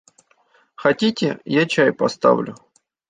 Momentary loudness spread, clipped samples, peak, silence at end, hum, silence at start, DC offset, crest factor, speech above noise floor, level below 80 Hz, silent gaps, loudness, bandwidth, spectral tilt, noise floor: 5 LU; under 0.1%; -2 dBFS; 0.55 s; none; 0.8 s; under 0.1%; 18 dB; 41 dB; -64 dBFS; none; -19 LUFS; 9.4 kHz; -5.5 dB/octave; -59 dBFS